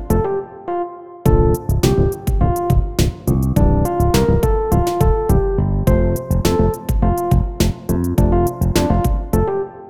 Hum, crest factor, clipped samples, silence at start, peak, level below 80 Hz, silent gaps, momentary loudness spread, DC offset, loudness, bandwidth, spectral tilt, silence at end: none; 16 dB; under 0.1%; 0 s; 0 dBFS; -20 dBFS; none; 5 LU; 1%; -17 LUFS; 19.5 kHz; -7 dB/octave; 0 s